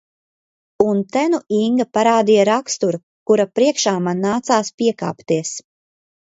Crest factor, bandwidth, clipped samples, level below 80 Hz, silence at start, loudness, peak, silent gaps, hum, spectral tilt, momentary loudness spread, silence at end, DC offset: 18 dB; 8 kHz; under 0.1%; -62 dBFS; 0.8 s; -18 LUFS; 0 dBFS; 3.03-3.26 s, 4.74-4.78 s; none; -4.5 dB/octave; 7 LU; 0.65 s; under 0.1%